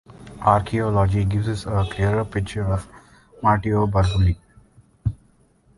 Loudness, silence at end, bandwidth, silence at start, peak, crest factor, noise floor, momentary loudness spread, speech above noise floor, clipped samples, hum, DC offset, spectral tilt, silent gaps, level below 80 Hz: -22 LUFS; 0.65 s; 11.5 kHz; 0.2 s; -2 dBFS; 20 dB; -57 dBFS; 10 LU; 38 dB; under 0.1%; none; under 0.1%; -7.5 dB/octave; none; -34 dBFS